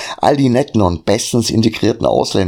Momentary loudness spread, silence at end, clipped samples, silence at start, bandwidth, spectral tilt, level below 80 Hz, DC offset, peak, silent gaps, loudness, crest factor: 2 LU; 0 s; under 0.1%; 0 s; 17 kHz; -5.5 dB/octave; -40 dBFS; under 0.1%; 0 dBFS; none; -14 LUFS; 14 dB